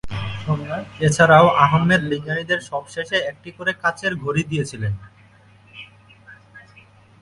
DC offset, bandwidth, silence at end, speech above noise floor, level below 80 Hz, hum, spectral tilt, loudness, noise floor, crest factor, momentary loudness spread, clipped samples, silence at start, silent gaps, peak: under 0.1%; 11.5 kHz; 0.6 s; 31 dB; -48 dBFS; none; -5.5 dB/octave; -19 LUFS; -50 dBFS; 20 dB; 17 LU; under 0.1%; 0.05 s; none; 0 dBFS